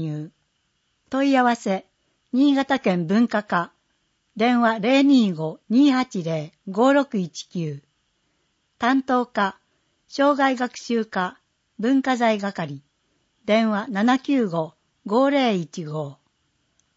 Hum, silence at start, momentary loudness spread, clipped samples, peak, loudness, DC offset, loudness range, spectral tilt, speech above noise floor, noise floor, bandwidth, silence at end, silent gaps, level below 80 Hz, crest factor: none; 0 s; 13 LU; under 0.1%; -6 dBFS; -22 LUFS; under 0.1%; 4 LU; -6 dB/octave; 50 dB; -70 dBFS; 8 kHz; 0.85 s; none; -70 dBFS; 16 dB